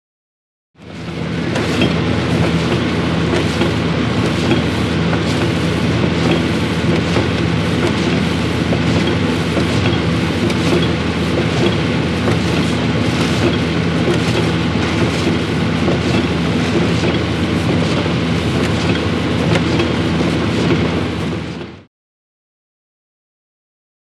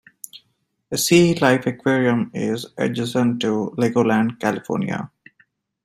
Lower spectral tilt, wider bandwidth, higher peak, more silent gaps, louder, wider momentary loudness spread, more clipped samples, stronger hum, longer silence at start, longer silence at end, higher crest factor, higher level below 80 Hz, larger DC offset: about the same, -6 dB/octave vs -5 dB/octave; second, 12.5 kHz vs 16 kHz; about the same, 0 dBFS vs -2 dBFS; neither; first, -16 LUFS vs -20 LUFS; second, 2 LU vs 13 LU; neither; neither; first, 0.8 s vs 0.35 s; first, 2.3 s vs 0.8 s; about the same, 16 dB vs 18 dB; first, -34 dBFS vs -60 dBFS; neither